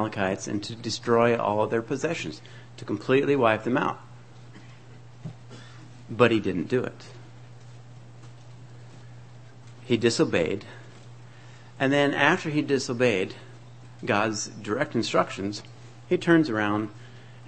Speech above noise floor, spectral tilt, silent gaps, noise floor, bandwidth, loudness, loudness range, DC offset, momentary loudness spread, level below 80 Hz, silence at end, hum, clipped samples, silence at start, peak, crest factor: 23 dB; -5 dB/octave; none; -48 dBFS; 8.8 kHz; -25 LUFS; 4 LU; 0.3%; 25 LU; -62 dBFS; 0 s; none; under 0.1%; 0 s; -2 dBFS; 24 dB